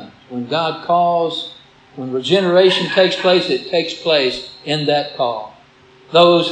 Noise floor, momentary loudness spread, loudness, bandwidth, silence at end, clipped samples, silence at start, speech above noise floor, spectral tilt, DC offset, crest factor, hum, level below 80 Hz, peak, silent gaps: -47 dBFS; 15 LU; -16 LUFS; 9.6 kHz; 0 s; under 0.1%; 0 s; 32 dB; -5 dB/octave; under 0.1%; 16 dB; none; -60 dBFS; 0 dBFS; none